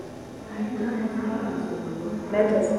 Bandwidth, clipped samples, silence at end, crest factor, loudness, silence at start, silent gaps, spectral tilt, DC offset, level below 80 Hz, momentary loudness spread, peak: 12 kHz; under 0.1%; 0 s; 18 dB; -28 LUFS; 0 s; none; -7 dB/octave; under 0.1%; -56 dBFS; 13 LU; -8 dBFS